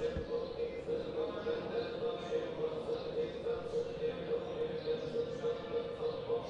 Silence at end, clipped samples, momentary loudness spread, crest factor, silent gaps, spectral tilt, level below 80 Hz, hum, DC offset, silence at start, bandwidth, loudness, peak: 0 s; under 0.1%; 2 LU; 12 dB; none; -6.5 dB/octave; -58 dBFS; none; under 0.1%; 0 s; 8.2 kHz; -38 LUFS; -26 dBFS